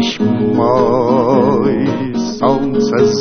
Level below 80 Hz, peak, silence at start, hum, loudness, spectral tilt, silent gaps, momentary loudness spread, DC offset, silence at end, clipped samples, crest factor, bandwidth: -42 dBFS; 0 dBFS; 0 s; none; -13 LUFS; -6.5 dB/octave; none; 5 LU; under 0.1%; 0 s; under 0.1%; 12 dB; 6.6 kHz